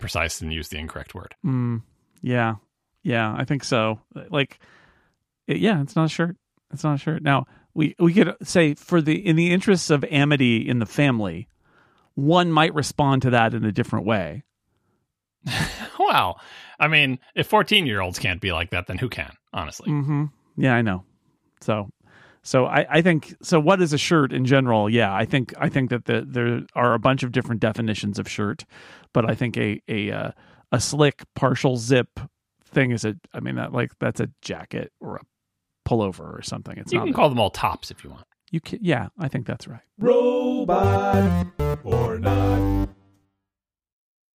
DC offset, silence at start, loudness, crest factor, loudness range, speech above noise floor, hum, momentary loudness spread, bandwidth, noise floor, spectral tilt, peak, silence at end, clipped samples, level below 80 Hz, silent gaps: under 0.1%; 0 s; -22 LUFS; 20 dB; 6 LU; 67 dB; none; 14 LU; 15.5 kHz; -89 dBFS; -5.5 dB/octave; -2 dBFS; 1.45 s; under 0.1%; -44 dBFS; none